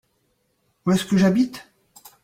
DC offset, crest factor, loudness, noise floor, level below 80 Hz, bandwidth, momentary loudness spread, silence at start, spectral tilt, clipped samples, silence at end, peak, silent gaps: under 0.1%; 18 dB; -21 LUFS; -69 dBFS; -56 dBFS; 15.5 kHz; 11 LU; 0.85 s; -6.5 dB/octave; under 0.1%; 0.6 s; -6 dBFS; none